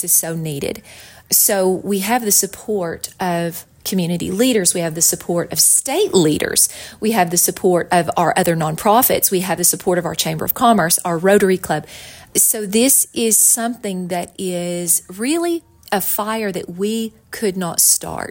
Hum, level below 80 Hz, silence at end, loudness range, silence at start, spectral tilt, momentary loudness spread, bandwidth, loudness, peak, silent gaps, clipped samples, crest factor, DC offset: none; -52 dBFS; 0 s; 4 LU; 0 s; -3 dB/octave; 11 LU; 17 kHz; -16 LUFS; 0 dBFS; none; under 0.1%; 18 dB; under 0.1%